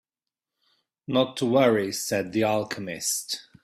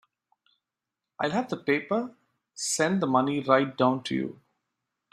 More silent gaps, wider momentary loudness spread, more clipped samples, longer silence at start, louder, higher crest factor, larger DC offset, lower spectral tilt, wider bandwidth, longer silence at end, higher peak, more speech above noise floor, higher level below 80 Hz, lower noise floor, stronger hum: neither; about the same, 10 LU vs 9 LU; neither; about the same, 1.1 s vs 1.2 s; about the same, -25 LUFS vs -27 LUFS; second, 18 dB vs 24 dB; neither; about the same, -4 dB/octave vs -4.5 dB/octave; first, 16 kHz vs 14.5 kHz; second, 0.25 s vs 0.8 s; about the same, -8 dBFS vs -6 dBFS; about the same, 65 dB vs 62 dB; first, -66 dBFS vs -72 dBFS; about the same, -90 dBFS vs -88 dBFS; neither